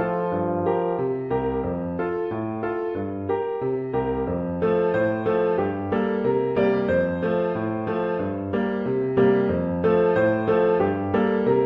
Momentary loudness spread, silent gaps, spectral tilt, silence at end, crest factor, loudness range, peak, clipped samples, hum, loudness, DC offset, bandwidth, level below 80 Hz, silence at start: 7 LU; none; -10 dB/octave; 0 s; 14 dB; 5 LU; -8 dBFS; under 0.1%; none; -23 LUFS; under 0.1%; 5.4 kHz; -46 dBFS; 0 s